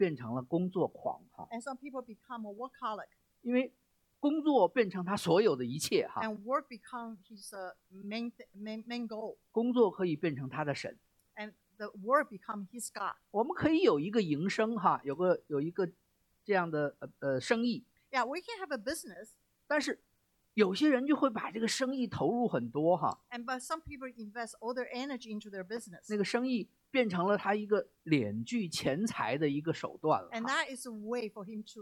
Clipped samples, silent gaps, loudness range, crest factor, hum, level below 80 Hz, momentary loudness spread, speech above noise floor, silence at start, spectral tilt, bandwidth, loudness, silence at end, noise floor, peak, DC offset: under 0.1%; none; 6 LU; 20 dB; none; -72 dBFS; 15 LU; 34 dB; 0 s; -5 dB/octave; 17 kHz; -34 LUFS; 0 s; -68 dBFS; -14 dBFS; under 0.1%